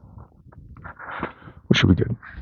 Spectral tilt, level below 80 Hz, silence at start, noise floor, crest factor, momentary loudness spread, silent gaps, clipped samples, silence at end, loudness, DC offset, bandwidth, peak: -6 dB/octave; -42 dBFS; 0.15 s; -46 dBFS; 24 dB; 23 LU; none; under 0.1%; 0 s; -21 LUFS; under 0.1%; 7 kHz; 0 dBFS